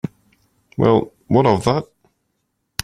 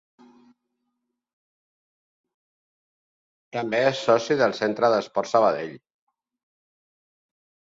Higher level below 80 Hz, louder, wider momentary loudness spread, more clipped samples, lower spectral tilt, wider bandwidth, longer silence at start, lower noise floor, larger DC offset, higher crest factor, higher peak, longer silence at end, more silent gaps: first, -48 dBFS vs -72 dBFS; first, -17 LUFS vs -22 LUFS; first, 15 LU vs 11 LU; neither; first, -6.5 dB/octave vs -5 dB/octave; first, 15 kHz vs 7.8 kHz; second, 0.05 s vs 3.55 s; second, -72 dBFS vs -79 dBFS; neither; about the same, 18 dB vs 22 dB; first, -2 dBFS vs -6 dBFS; second, 1 s vs 1.95 s; neither